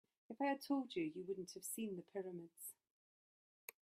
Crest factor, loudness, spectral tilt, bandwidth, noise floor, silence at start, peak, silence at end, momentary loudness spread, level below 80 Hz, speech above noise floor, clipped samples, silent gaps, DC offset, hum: 18 dB; -46 LUFS; -4.5 dB/octave; 15.5 kHz; under -90 dBFS; 0.3 s; -30 dBFS; 1.1 s; 14 LU; -90 dBFS; over 45 dB; under 0.1%; none; under 0.1%; none